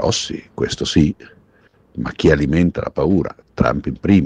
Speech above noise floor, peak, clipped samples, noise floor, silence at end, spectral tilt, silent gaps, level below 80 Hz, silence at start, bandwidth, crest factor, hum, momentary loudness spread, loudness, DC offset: 37 dB; 0 dBFS; under 0.1%; -54 dBFS; 0 s; -6 dB/octave; none; -34 dBFS; 0 s; 9.8 kHz; 18 dB; none; 12 LU; -18 LUFS; under 0.1%